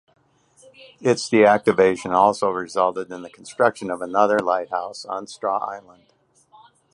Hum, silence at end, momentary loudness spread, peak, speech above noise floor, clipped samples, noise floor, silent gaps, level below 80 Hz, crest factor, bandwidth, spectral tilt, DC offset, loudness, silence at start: none; 1.15 s; 16 LU; -2 dBFS; 36 dB; under 0.1%; -56 dBFS; none; -64 dBFS; 20 dB; 11.5 kHz; -5 dB/octave; under 0.1%; -20 LUFS; 1 s